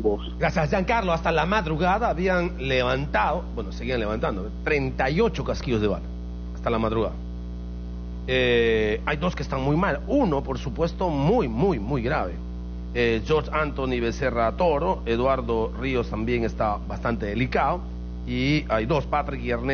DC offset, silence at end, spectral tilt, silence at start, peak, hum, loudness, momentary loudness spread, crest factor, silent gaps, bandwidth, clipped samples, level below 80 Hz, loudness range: under 0.1%; 0 s; -5 dB/octave; 0 s; -8 dBFS; 60 Hz at -35 dBFS; -24 LUFS; 9 LU; 16 dB; none; 6.8 kHz; under 0.1%; -34 dBFS; 3 LU